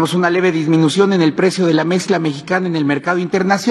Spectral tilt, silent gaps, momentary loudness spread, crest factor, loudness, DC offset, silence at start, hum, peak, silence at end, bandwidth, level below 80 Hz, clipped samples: -6 dB/octave; none; 5 LU; 14 dB; -15 LUFS; under 0.1%; 0 s; none; 0 dBFS; 0 s; 12.5 kHz; -64 dBFS; under 0.1%